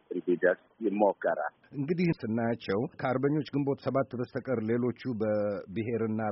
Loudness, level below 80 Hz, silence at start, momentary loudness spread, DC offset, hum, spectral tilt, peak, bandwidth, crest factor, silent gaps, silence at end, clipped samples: -31 LUFS; -68 dBFS; 0.1 s; 6 LU; under 0.1%; none; -7 dB/octave; -10 dBFS; 5.8 kHz; 20 dB; none; 0 s; under 0.1%